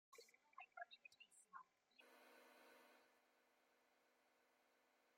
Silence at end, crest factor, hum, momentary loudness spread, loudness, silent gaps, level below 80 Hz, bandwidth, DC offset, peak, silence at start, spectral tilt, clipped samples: 0 s; 26 dB; none; 9 LU; -65 LUFS; none; under -90 dBFS; 16.5 kHz; under 0.1%; -42 dBFS; 0.1 s; 0 dB/octave; under 0.1%